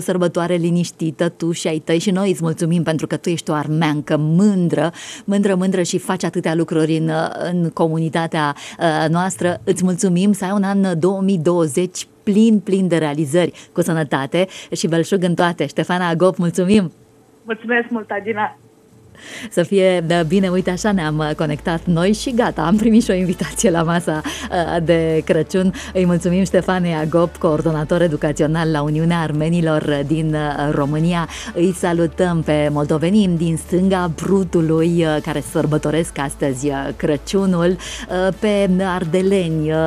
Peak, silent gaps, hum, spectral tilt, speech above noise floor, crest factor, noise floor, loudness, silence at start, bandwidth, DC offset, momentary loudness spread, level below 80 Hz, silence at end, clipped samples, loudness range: -2 dBFS; none; none; -6 dB/octave; 30 dB; 16 dB; -47 dBFS; -18 LUFS; 0 s; 14 kHz; under 0.1%; 6 LU; -42 dBFS; 0 s; under 0.1%; 2 LU